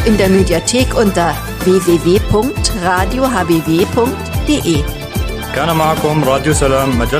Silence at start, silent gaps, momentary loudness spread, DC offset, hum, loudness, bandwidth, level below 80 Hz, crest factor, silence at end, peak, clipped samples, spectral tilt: 0 s; none; 6 LU; under 0.1%; none; -13 LUFS; 15.5 kHz; -24 dBFS; 12 dB; 0 s; 0 dBFS; under 0.1%; -5 dB/octave